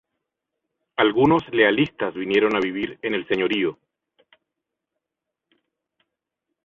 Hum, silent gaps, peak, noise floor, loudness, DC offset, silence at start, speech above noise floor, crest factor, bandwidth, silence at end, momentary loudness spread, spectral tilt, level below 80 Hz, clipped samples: none; none; -2 dBFS; -84 dBFS; -21 LUFS; under 0.1%; 1 s; 64 dB; 22 dB; 7.2 kHz; 2.9 s; 10 LU; -7 dB/octave; -60 dBFS; under 0.1%